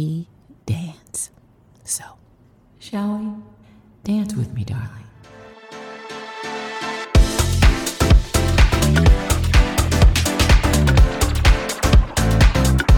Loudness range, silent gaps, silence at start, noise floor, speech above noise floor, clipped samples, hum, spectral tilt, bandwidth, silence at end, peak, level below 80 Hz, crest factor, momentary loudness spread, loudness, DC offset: 12 LU; none; 0 s; -52 dBFS; 28 dB; under 0.1%; none; -5 dB/octave; 18 kHz; 0 s; 0 dBFS; -20 dBFS; 16 dB; 17 LU; -18 LUFS; under 0.1%